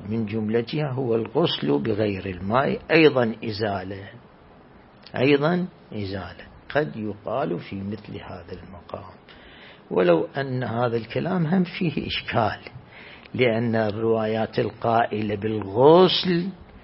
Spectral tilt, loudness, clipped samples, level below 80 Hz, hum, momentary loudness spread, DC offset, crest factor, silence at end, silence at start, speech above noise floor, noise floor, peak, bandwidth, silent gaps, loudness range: -10.5 dB/octave; -23 LUFS; under 0.1%; -56 dBFS; none; 19 LU; under 0.1%; 22 dB; 0.05 s; 0 s; 27 dB; -50 dBFS; -2 dBFS; 5.8 kHz; none; 9 LU